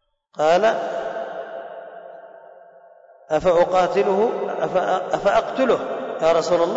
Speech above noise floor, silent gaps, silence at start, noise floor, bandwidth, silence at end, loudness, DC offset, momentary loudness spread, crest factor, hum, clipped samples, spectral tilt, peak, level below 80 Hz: 30 dB; none; 0.35 s; -49 dBFS; 7.8 kHz; 0 s; -20 LUFS; under 0.1%; 18 LU; 14 dB; none; under 0.1%; -5 dB/octave; -8 dBFS; -54 dBFS